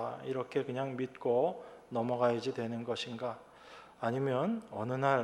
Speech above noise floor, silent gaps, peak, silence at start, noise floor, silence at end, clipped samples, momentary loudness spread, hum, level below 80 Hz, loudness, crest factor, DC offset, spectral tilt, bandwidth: 21 dB; none; -16 dBFS; 0 s; -55 dBFS; 0 s; under 0.1%; 11 LU; none; -76 dBFS; -35 LUFS; 20 dB; under 0.1%; -6.5 dB/octave; 12 kHz